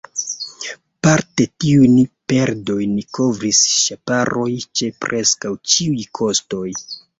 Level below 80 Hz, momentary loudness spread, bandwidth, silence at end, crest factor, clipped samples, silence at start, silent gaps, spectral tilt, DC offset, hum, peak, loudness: -52 dBFS; 13 LU; 8 kHz; 0.2 s; 18 dB; under 0.1%; 0.15 s; none; -3.5 dB/octave; under 0.1%; none; 0 dBFS; -17 LUFS